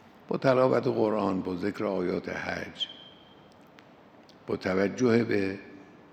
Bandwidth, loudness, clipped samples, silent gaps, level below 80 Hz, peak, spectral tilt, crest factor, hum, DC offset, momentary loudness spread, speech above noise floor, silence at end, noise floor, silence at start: 9 kHz; -28 LUFS; under 0.1%; none; -72 dBFS; -8 dBFS; -6.5 dB/octave; 20 dB; none; under 0.1%; 12 LU; 27 dB; 0.3 s; -54 dBFS; 0.3 s